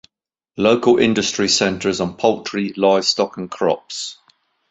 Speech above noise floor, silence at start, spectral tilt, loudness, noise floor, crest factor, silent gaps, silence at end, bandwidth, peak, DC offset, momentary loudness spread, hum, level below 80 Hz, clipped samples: 61 dB; 0.55 s; -3.5 dB/octave; -18 LUFS; -79 dBFS; 18 dB; none; 0.55 s; 8.2 kHz; -2 dBFS; under 0.1%; 10 LU; none; -54 dBFS; under 0.1%